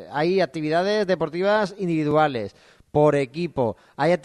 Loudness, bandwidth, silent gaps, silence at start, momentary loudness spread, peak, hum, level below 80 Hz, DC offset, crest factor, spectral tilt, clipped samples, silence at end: -22 LUFS; 11 kHz; none; 0 s; 7 LU; -6 dBFS; none; -58 dBFS; under 0.1%; 16 dB; -7 dB/octave; under 0.1%; 0.05 s